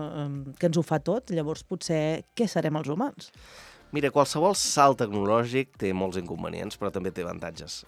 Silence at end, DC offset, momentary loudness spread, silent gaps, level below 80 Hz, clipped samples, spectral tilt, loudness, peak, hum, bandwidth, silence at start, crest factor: 0.05 s; under 0.1%; 12 LU; none; -58 dBFS; under 0.1%; -5 dB/octave; -27 LUFS; -6 dBFS; none; 15.5 kHz; 0 s; 22 dB